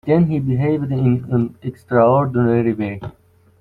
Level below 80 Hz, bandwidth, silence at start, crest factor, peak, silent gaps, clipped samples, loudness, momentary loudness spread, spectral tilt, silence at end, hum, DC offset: -48 dBFS; 4.4 kHz; 0.05 s; 14 dB; -4 dBFS; none; under 0.1%; -18 LUFS; 12 LU; -11 dB/octave; 0.5 s; none; under 0.1%